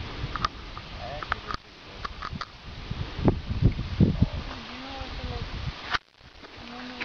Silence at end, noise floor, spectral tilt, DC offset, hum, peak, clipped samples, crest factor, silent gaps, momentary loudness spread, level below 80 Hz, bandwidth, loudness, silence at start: 0 s; -50 dBFS; -7 dB/octave; 0.1%; none; -6 dBFS; under 0.1%; 24 dB; none; 15 LU; -38 dBFS; 6.8 kHz; -31 LUFS; 0 s